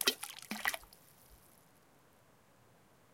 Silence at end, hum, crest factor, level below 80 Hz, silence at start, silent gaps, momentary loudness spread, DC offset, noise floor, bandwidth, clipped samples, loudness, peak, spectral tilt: 1.8 s; none; 34 dB; -74 dBFS; 0 s; none; 25 LU; under 0.1%; -67 dBFS; 17 kHz; under 0.1%; -38 LUFS; -10 dBFS; -0.5 dB/octave